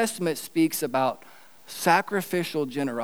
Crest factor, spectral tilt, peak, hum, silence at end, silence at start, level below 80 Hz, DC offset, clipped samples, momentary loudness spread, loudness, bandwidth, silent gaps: 20 dB; -4 dB/octave; -6 dBFS; none; 0 s; 0 s; -82 dBFS; 0.3%; under 0.1%; 7 LU; -26 LUFS; over 20 kHz; none